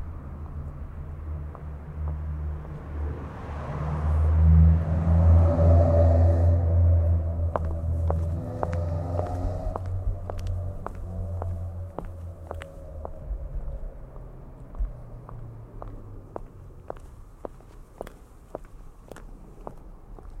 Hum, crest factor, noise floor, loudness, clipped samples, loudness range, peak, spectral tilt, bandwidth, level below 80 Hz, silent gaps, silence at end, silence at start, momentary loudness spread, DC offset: none; 20 dB; -46 dBFS; -25 LUFS; under 0.1%; 23 LU; -6 dBFS; -10 dB/octave; 2.9 kHz; -30 dBFS; none; 0 s; 0 s; 24 LU; under 0.1%